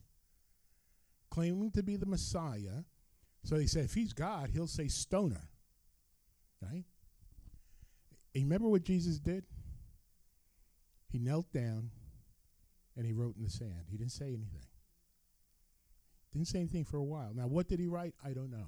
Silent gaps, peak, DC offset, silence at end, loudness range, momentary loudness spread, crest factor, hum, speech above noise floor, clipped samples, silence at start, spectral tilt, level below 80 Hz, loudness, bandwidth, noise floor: none; -20 dBFS; under 0.1%; 0 s; 6 LU; 14 LU; 20 dB; none; 36 dB; under 0.1%; 1.3 s; -6.5 dB/octave; -52 dBFS; -38 LUFS; over 20 kHz; -73 dBFS